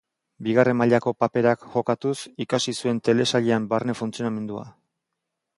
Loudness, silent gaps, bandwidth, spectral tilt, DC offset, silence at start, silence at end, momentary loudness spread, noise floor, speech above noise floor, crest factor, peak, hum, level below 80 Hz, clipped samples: -23 LUFS; none; 11.5 kHz; -5.5 dB/octave; under 0.1%; 0.4 s; 0.85 s; 10 LU; -82 dBFS; 59 dB; 20 dB; -4 dBFS; none; -64 dBFS; under 0.1%